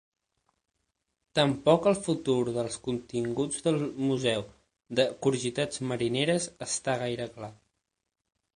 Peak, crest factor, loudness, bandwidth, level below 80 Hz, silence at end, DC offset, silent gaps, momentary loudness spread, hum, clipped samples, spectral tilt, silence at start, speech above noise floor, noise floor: -8 dBFS; 22 dB; -29 LUFS; 10.5 kHz; -62 dBFS; 1 s; under 0.1%; none; 9 LU; none; under 0.1%; -4.5 dB/octave; 1.35 s; 52 dB; -81 dBFS